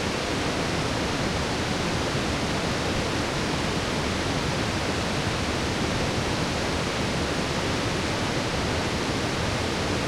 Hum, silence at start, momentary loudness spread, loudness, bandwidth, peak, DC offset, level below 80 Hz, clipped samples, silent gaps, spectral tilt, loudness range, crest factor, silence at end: none; 0 s; 0 LU; -26 LUFS; 16.5 kHz; -12 dBFS; under 0.1%; -40 dBFS; under 0.1%; none; -4.5 dB/octave; 0 LU; 14 dB; 0 s